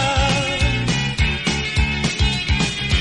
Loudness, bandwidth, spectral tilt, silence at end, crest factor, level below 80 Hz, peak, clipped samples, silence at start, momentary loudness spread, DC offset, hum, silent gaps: -19 LUFS; 11.5 kHz; -4 dB/octave; 0 s; 14 dB; -26 dBFS; -4 dBFS; under 0.1%; 0 s; 2 LU; under 0.1%; none; none